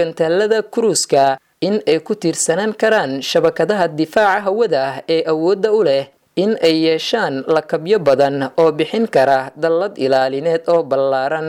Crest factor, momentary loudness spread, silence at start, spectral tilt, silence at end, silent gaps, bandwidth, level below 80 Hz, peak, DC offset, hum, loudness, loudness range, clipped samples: 12 dB; 4 LU; 0 s; -4 dB/octave; 0 s; none; 15 kHz; -62 dBFS; -4 dBFS; under 0.1%; none; -16 LUFS; 1 LU; under 0.1%